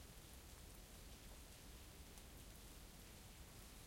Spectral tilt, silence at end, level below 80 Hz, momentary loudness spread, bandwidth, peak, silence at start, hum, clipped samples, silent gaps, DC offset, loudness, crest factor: -3.5 dB/octave; 0 s; -62 dBFS; 0 LU; 16.5 kHz; -42 dBFS; 0 s; none; under 0.1%; none; under 0.1%; -60 LUFS; 18 dB